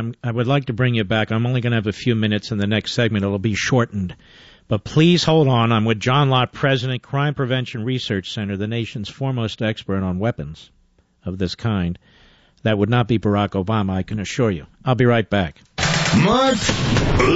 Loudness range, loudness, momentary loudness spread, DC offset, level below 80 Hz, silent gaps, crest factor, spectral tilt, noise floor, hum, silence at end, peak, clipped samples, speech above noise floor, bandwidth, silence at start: 7 LU; -20 LUFS; 10 LU; under 0.1%; -40 dBFS; none; 16 dB; -5 dB/octave; -55 dBFS; none; 0 s; -4 dBFS; under 0.1%; 36 dB; 8 kHz; 0 s